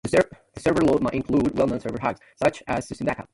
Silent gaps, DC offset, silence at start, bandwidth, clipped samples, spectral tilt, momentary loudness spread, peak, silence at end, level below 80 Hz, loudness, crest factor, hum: none; under 0.1%; 0.05 s; 11.5 kHz; under 0.1%; -6.5 dB/octave; 8 LU; -6 dBFS; 0.1 s; -48 dBFS; -24 LUFS; 18 dB; none